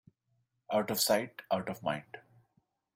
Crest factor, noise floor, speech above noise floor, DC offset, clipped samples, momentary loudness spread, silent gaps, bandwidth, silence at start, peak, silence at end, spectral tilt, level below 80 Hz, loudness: 20 dB; -78 dBFS; 45 dB; under 0.1%; under 0.1%; 15 LU; none; 16 kHz; 0.7 s; -16 dBFS; 0.75 s; -3 dB/octave; -74 dBFS; -33 LUFS